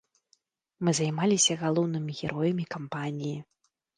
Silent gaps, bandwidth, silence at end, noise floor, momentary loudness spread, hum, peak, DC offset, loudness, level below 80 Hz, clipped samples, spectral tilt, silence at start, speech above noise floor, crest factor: none; 10.5 kHz; 0.55 s; -71 dBFS; 12 LU; none; -10 dBFS; under 0.1%; -28 LUFS; -68 dBFS; under 0.1%; -4 dB/octave; 0.8 s; 42 dB; 18 dB